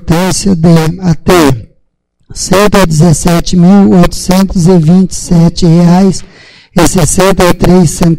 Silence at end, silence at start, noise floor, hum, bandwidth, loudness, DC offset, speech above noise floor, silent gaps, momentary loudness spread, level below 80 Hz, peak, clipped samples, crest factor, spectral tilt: 0 s; 0 s; -54 dBFS; none; 16.5 kHz; -7 LUFS; under 0.1%; 49 dB; none; 6 LU; -22 dBFS; 0 dBFS; 3%; 6 dB; -6 dB/octave